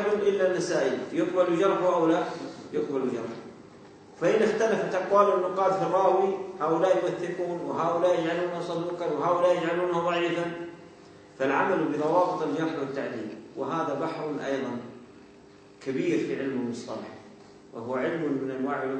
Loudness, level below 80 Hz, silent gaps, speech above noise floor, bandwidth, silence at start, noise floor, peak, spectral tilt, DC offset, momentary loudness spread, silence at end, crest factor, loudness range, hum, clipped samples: -27 LUFS; -70 dBFS; none; 26 dB; 9.2 kHz; 0 s; -52 dBFS; -8 dBFS; -6 dB/octave; under 0.1%; 13 LU; 0 s; 20 dB; 7 LU; none; under 0.1%